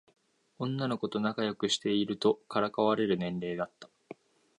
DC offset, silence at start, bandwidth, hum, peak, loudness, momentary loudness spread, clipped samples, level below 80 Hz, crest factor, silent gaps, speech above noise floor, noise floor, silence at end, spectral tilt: under 0.1%; 0.6 s; 11 kHz; none; -14 dBFS; -31 LUFS; 15 LU; under 0.1%; -70 dBFS; 18 dB; none; 21 dB; -52 dBFS; 0.45 s; -5 dB/octave